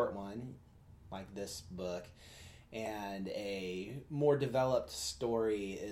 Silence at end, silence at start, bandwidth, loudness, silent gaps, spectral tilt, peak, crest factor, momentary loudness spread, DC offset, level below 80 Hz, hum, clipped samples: 0 s; 0 s; 16 kHz; -38 LUFS; none; -5 dB/octave; -18 dBFS; 20 dB; 18 LU; under 0.1%; -62 dBFS; none; under 0.1%